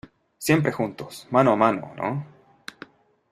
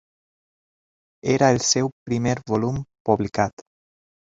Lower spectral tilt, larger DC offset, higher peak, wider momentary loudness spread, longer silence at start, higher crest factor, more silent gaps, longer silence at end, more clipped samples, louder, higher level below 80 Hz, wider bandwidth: first, -6 dB/octave vs -4.5 dB/octave; neither; about the same, -2 dBFS vs -2 dBFS; first, 23 LU vs 9 LU; second, 0.4 s vs 1.25 s; about the same, 22 dB vs 22 dB; second, none vs 1.92-2.06 s, 3.00-3.05 s; first, 1.05 s vs 0.75 s; neither; about the same, -23 LUFS vs -22 LUFS; second, -62 dBFS vs -52 dBFS; first, 15.5 kHz vs 7.8 kHz